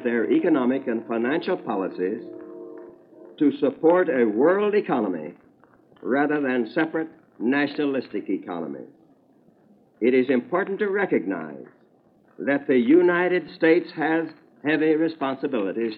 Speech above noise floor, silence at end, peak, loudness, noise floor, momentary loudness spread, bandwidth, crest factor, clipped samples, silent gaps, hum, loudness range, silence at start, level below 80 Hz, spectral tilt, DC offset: 36 dB; 0 s; -6 dBFS; -23 LUFS; -59 dBFS; 15 LU; 5.2 kHz; 18 dB; under 0.1%; none; none; 5 LU; 0 s; -82 dBFS; -9.5 dB/octave; under 0.1%